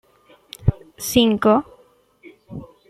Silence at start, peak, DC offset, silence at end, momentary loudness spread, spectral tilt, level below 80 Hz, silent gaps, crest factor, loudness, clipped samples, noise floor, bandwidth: 0.6 s; -2 dBFS; under 0.1%; 0.25 s; 22 LU; -5.5 dB/octave; -38 dBFS; none; 20 dB; -19 LUFS; under 0.1%; -55 dBFS; 15.5 kHz